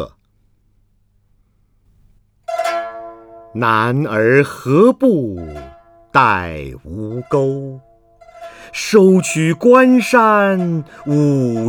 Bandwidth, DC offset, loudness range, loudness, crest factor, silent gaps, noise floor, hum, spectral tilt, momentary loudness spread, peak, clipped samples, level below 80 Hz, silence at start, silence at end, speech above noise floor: 19 kHz; under 0.1%; 9 LU; -14 LUFS; 16 dB; none; -57 dBFS; 50 Hz at -50 dBFS; -6 dB/octave; 20 LU; 0 dBFS; under 0.1%; -48 dBFS; 0 s; 0 s; 44 dB